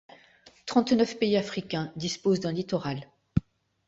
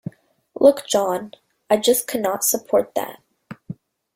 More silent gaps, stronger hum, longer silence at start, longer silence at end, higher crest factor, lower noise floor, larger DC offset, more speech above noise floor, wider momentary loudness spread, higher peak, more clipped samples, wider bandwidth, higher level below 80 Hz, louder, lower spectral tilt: neither; neither; first, 0.65 s vs 0.05 s; about the same, 0.5 s vs 0.4 s; about the same, 20 dB vs 20 dB; first, -57 dBFS vs -41 dBFS; neither; first, 30 dB vs 22 dB; second, 9 LU vs 22 LU; second, -8 dBFS vs -2 dBFS; neither; second, 8 kHz vs 16.5 kHz; first, -54 dBFS vs -62 dBFS; second, -28 LUFS vs -20 LUFS; first, -6 dB/octave vs -3 dB/octave